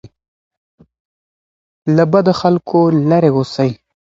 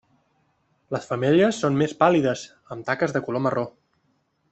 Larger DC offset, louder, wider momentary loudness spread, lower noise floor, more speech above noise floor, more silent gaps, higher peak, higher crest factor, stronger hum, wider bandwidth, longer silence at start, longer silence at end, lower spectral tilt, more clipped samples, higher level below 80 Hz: neither; first, -14 LUFS vs -23 LUFS; second, 7 LU vs 14 LU; first, under -90 dBFS vs -69 dBFS; first, over 78 dB vs 46 dB; first, 0.28-0.51 s, 0.57-0.78 s, 1.00-1.82 s vs none; about the same, 0 dBFS vs -2 dBFS; second, 16 dB vs 22 dB; neither; about the same, 7.8 kHz vs 8.4 kHz; second, 0.05 s vs 0.9 s; second, 0.4 s vs 0.8 s; first, -8 dB/octave vs -6 dB/octave; neither; first, -54 dBFS vs -64 dBFS